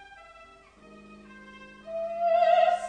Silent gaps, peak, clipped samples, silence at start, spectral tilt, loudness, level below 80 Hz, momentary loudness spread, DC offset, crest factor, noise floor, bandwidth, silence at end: none; -10 dBFS; under 0.1%; 0 s; -3.5 dB/octave; -25 LUFS; -66 dBFS; 27 LU; under 0.1%; 18 dB; -53 dBFS; 9.6 kHz; 0 s